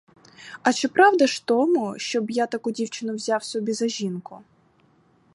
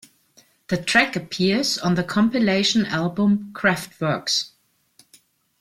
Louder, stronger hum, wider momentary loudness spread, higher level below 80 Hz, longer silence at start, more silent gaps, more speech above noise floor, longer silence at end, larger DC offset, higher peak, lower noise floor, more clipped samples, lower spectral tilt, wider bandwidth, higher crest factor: about the same, -23 LUFS vs -21 LUFS; neither; first, 12 LU vs 7 LU; second, -76 dBFS vs -58 dBFS; second, 0.4 s vs 0.7 s; neither; about the same, 38 dB vs 37 dB; second, 0.95 s vs 1.15 s; neither; about the same, -4 dBFS vs -4 dBFS; about the same, -60 dBFS vs -58 dBFS; neither; about the same, -4 dB/octave vs -4.5 dB/octave; second, 11.5 kHz vs 15 kHz; about the same, 20 dB vs 20 dB